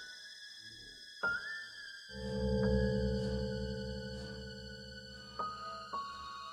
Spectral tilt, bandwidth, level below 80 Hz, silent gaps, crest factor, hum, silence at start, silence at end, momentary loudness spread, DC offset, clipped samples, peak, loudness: -6 dB/octave; 12.5 kHz; -48 dBFS; none; 18 dB; none; 0 s; 0 s; 15 LU; under 0.1%; under 0.1%; -20 dBFS; -39 LUFS